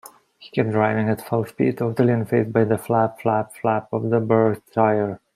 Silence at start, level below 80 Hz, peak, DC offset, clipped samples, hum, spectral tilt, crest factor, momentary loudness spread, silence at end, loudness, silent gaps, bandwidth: 0.4 s; -60 dBFS; -4 dBFS; under 0.1%; under 0.1%; none; -8 dB/octave; 16 dB; 5 LU; 0.2 s; -21 LUFS; none; 15.5 kHz